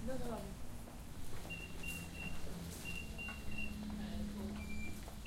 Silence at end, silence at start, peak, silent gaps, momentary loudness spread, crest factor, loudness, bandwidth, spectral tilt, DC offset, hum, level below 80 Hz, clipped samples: 0 s; 0 s; -30 dBFS; none; 7 LU; 14 dB; -46 LUFS; 16 kHz; -4.5 dB/octave; under 0.1%; none; -50 dBFS; under 0.1%